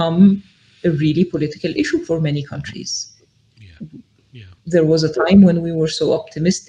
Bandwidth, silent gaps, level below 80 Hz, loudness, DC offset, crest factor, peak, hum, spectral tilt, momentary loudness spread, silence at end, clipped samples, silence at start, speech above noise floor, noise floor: 9.2 kHz; none; -50 dBFS; -17 LUFS; under 0.1%; 16 dB; 0 dBFS; none; -6.5 dB/octave; 19 LU; 0.1 s; under 0.1%; 0 s; 33 dB; -49 dBFS